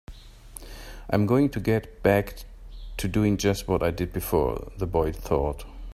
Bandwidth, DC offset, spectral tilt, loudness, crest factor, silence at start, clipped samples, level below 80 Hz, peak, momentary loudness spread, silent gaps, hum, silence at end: 16 kHz; under 0.1%; -6.5 dB/octave; -25 LUFS; 22 dB; 0.1 s; under 0.1%; -38 dBFS; -4 dBFS; 20 LU; none; none; 0 s